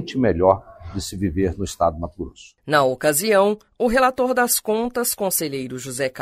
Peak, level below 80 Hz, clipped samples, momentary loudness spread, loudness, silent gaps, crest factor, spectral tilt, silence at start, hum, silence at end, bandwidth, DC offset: -2 dBFS; -42 dBFS; under 0.1%; 13 LU; -20 LUFS; none; 20 dB; -4 dB/octave; 0 s; none; 0 s; 16 kHz; under 0.1%